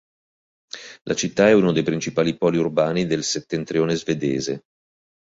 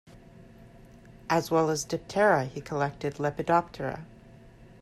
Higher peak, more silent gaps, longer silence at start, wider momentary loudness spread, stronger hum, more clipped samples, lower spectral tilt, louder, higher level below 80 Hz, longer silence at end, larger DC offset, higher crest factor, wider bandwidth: first, -2 dBFS vs -10 dBFS; first, 1.01-1.05 s vs none; first, 0.75 s vs 0.15 s; first, 17 LU vs 12 LU; neither; neither; about the same, -5 dB/octave vs -5 dB/octave; first, -21 LUFS vs -28 LUFS; about the same, -56 dBFS vs -58 dBFS; first, 0.75 s vs 0.3 s; neither; about the same, 20 dB vs 20 dB; second, 8 kHz vs 14.5 kHz